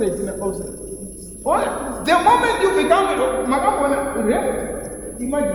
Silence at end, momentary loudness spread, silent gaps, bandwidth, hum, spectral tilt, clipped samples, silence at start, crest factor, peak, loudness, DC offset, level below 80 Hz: 0 s; 15 LU; none; 20 kHz; none; -4 dB/octave; under 0.1%; 0 s; 18 dB; -2 dBFS; -19 LUFS; under 0.1%; -40 dBFS